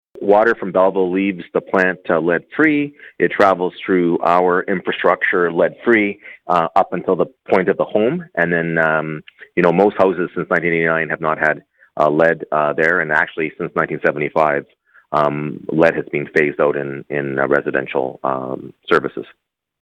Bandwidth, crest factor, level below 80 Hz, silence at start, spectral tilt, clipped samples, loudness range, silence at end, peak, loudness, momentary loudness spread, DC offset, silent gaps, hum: 9.2 kHz; 16 dB; -58 dBFS; 0.15 s; -7.5 dB/octave; under 0.1%; 2 LU; 0.6 s; 0 dBFS; -17 LUFS; 8 LU; under 0.1%; none; none